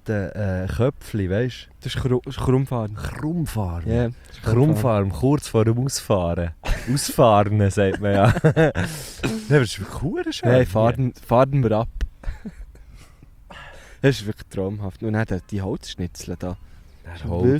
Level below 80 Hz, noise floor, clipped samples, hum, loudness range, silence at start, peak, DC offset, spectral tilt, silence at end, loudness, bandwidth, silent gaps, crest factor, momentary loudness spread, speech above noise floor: -38 dBFS; -46 dBFS; under 0.1%; none; 8 LU; 0.05 s; -4 dBFS; under 0.1%; -6.5 dB/octave; 0 s; -22 LUFS; 16 kHz; none; 18 dB; 14 LU; 25 dB